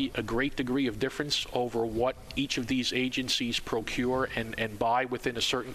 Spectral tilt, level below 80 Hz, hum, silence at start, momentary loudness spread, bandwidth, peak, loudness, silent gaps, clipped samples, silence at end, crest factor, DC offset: -4 dB/octave; -50 dBFS; none; 0 s; 4 LU; 14.5 kHz; -12 dBFS; -30 LUFS; none; under 0.1%; 0 s; 18 dB; under 0.1%